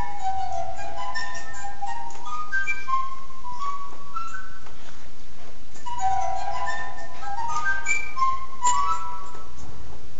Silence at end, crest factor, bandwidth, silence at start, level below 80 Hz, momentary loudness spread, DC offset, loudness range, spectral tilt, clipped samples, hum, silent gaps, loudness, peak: 0 s; 20 dB; 8.2 kHz; 0 s; -50 dBFS; 20 LU; 10%; 6 LU; -2.5 dB/octave; under 0.1%; none; none; -29 LUFS; -8 dBFS